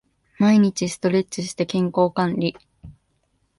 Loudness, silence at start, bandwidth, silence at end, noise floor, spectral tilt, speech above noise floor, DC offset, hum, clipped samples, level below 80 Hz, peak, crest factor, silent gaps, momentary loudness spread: -21 LUFS; 0.4 s; 11.5 kHz; 0.7 s; -68 dBFS; -6 dB/octave; 48 dB; under 0.1%; none; under 0.1%; -58 dBFS; -6 dBFS; 16 dB; none; 9 LU